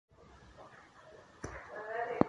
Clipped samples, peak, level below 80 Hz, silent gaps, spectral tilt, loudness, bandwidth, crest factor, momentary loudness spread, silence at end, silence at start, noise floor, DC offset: under 0.1%; -8 dBFS; -62 dBFS; none; -7 dB/octave; -45 LUFS; 11 kHz; 32 dB; 19 LU; 0 s; 0.2 s; -58 dBFS; under 0.1%